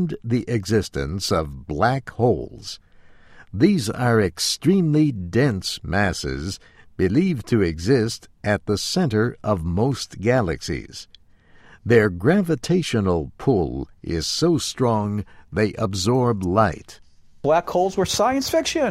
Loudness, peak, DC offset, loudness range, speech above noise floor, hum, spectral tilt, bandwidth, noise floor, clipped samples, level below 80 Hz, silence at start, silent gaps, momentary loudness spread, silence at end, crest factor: -21 LUFS; -2 dBFS; under 0.1%; 2 LU; 30 dB; none; -5.5 dB/octave; 16 kHz; -51 dBFS; under 0.1%; -42 dBFS; 0 s; none; 11 LU; 0 s; 18 dB